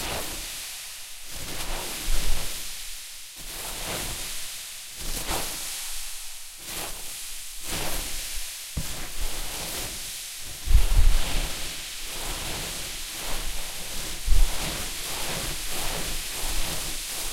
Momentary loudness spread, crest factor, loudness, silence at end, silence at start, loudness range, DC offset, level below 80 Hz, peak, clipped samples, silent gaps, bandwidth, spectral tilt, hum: 8 LU; 20 dB; -31 LUFS; 0 s; 0 s; 4 LU; under 0.1%; -30 dBFS; -6 dBFS; under 0.1%; none; 16 kHz; -2 dB/octave; none